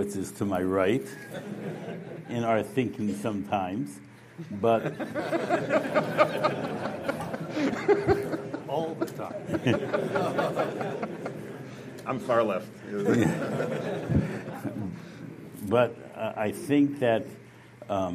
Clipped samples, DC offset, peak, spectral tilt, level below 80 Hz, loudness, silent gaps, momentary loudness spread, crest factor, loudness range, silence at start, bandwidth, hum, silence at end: under 0.1%; under 0.1%; -6 dBFS; -6.5 dB/octave; -56 dBFS; -29 LUFS; none; 14 LU; 22 dB; 3 LU; 0 s; 15.5 kHz; none; 0 s